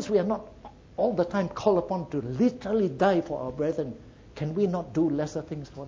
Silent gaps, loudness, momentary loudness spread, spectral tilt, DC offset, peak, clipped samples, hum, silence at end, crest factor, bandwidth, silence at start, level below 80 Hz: none; -28 LUFS; 12 LU; -7.5 dB/octave; under 0.1%; -8 dBFS; under 0.1%; none; 0 s; 18 dB; 7.8 kHz; 0 s; -54 dBFS